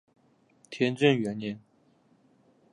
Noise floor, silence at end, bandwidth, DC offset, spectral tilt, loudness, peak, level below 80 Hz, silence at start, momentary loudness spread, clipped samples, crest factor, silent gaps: -65 dBFS; 1.15 s; 11 kHz; under 0.1%; -6.5 dB/octave; -27 LUFS; -8 dBFS; -74 dBFS; 0.7 s; 20 LU; under 0.1%; 24 dB; none